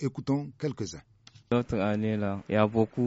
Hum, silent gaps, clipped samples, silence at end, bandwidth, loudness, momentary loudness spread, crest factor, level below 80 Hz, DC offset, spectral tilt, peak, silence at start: none; none; under 0.1%; 0 s; 8 kHz; -29 LUFS; 11 LU; 20 dB; -56 dBFS; under 0.1%; -7 dB/octave; -10 dBFS; 0 s